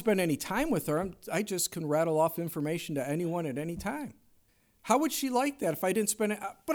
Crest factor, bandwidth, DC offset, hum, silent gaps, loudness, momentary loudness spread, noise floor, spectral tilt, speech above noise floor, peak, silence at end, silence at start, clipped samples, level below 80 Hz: 20 dB; over 20 kHz; under 0.1%; none; none; -31 LUFS; 8 LU; -67 dBFS; -4.5 dB/octave; 37 dB; -12 dBFS; 0 s; 0 s; under 0.1%; -58 dBFS